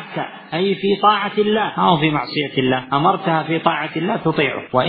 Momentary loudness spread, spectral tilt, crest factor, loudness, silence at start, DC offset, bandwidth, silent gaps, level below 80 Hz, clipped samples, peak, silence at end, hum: 6 LU; -11 dB/octave; 18 dB; -18 LUFS; 0 s; under 0.1%; 5.2 kHz; none; -52 dBFS; under 0.1%; 0 dBFS; 0 s; none